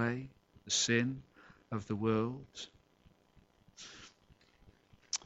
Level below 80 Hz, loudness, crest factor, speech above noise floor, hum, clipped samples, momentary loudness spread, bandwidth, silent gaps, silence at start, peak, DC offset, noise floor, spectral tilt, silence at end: -68 dBFS; -35 LUFS; 24 dB; 32 dB; none; under 0.1%; 22 LU; 8.2 kHz; none; 0 s; -16 dBFS; under 0.1%; -67 dBFS; -3.5 dB/octave; 0.1 s